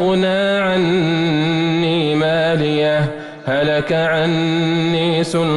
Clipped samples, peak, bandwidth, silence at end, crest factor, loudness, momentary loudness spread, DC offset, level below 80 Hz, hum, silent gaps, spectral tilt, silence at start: under 0.1%; -6 dBFS; 11.5 kHz; 0 s; 10 dB; -16 LUFS; 1 LU; under 0.1%; -50 dBFS; none; none; -6.5 dB/octave; 0 s